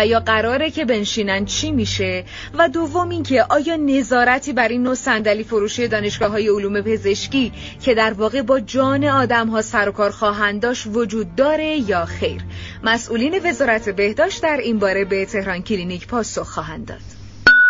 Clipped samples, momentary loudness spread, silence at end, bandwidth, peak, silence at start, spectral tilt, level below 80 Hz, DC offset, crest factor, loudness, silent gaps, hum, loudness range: under 0.1%; 8 LU; 0 s; 7.6 kHz; 0 dBFS; 0 s; -3 dB/octave; -42 dBFS; under 0.1%; 18 dB; -18 LUFS; none; none; 2 LU